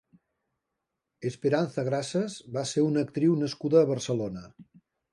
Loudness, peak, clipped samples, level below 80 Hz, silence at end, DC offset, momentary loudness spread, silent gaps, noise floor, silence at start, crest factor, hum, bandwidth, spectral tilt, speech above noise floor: -28 LUFS; -10 dBFS; under 0.1%; -68 dBFS; 0.5 s; under 0.1%; 12 LU; none; -84 dBFS; 1.2 s; 18 dB; none; 11.5 kHz; -6 dB/octave; 57 dB